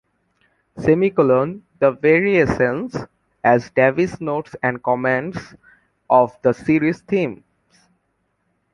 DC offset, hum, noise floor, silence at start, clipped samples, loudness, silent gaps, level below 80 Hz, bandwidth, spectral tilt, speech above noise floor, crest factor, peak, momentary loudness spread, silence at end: under 0.1%; none; -69 dBFS; 0.75 s; under 0.1%; -18 LUFS; none; -50 dBFS; 10.5 kHz; -8 dB/octave; 51 dB; 18 dB; -2 dBFS; 11 LU; 1.4 s